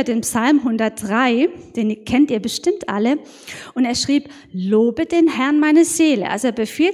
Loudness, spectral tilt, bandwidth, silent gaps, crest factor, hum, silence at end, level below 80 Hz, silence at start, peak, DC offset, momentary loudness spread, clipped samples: -18 LUFS; -4 dB/octave; 16 kHz; none; 14 dB; none; 0 s; -52 dBFS; 0 s; -4 dBFS; under 0.1%; 9 LU; under 0.1%